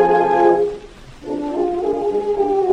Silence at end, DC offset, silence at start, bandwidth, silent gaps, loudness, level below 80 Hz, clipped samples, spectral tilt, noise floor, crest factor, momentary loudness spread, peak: 0 s; under 0.1%; 0 s; 9.4 kHz; none; -18 LUFS; -44 dBFS; under 0.1%; -7 dB/octave; -37 dBFS; 14 dB; 14 LU; -4 dBFS